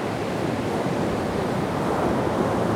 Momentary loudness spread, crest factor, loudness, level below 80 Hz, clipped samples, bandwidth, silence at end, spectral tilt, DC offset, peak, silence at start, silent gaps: 3 LU; 14 dB; -25 LUFS; -46 dBFS; under 0.1%; 18 kHz; 0 s; -6.5 dB/octave; under 0.1%; -10 dBFS; 0 s; none